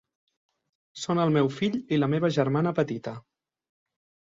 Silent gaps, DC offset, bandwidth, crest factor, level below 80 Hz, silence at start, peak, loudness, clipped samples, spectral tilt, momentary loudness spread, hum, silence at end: none; under 0.1%; 7.8 kHz; 18 dB; -66 dBFS; 0.95 s; -10 dBFS; -26 LUFS; under 0.1%; -7 dB/octave; 12 LU; none; 1.1 s